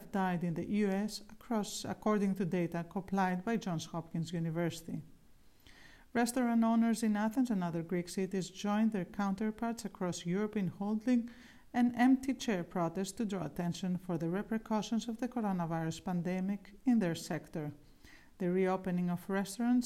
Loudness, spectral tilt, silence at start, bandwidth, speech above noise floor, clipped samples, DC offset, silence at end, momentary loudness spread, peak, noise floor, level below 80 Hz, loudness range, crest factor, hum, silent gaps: -35 LUFS; -6 dB/octave; 0 s; 15.5 kHz; 26 dB; under 0.1%; under 0.1%; 0 s; 8 LU; -18 dBFS; -60 dBFS; -64 dBFS; 3 LU; 18 dB; none; none